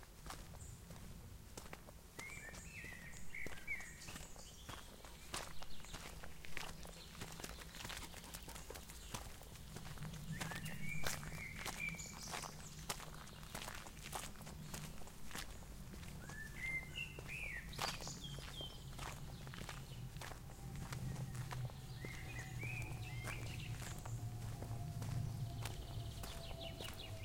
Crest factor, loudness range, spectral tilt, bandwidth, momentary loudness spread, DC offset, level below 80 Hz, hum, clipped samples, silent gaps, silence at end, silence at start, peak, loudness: 24 dB; 5 LU; -3.5 dB/octave; 16.5 kHz; 10 LU; under 0.1%; -56 dBFS; none; under 0.1%; none; 0 s; 0 s; -24 dBFS; -49 LUFS